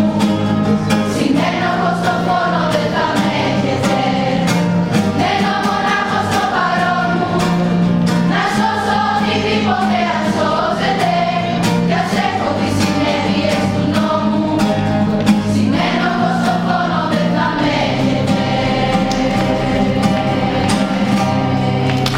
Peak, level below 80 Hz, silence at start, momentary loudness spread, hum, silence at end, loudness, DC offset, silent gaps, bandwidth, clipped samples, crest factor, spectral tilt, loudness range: 0 dBFS; -38 dBFS; 0 s; 1 LU; none; 0 s; -15 LUFS; under 0.1%; none; 16 kHz; under 0.1%; 14 dB; -6 dB/octave; 1 LU